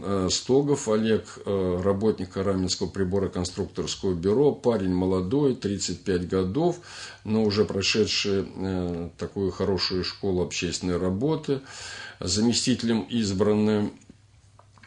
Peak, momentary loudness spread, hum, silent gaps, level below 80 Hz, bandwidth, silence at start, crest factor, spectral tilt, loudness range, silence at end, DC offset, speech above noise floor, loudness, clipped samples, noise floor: -8 dBFS; 8 LU; none; none; -56 dBFS; 10.5 kHz; 0 s; 18 dB; -5 dB/octave; 2 LU; 0.9 s; under 0.1%; 30 dB; -25 LUFS; under 0.1%; -55 dBFS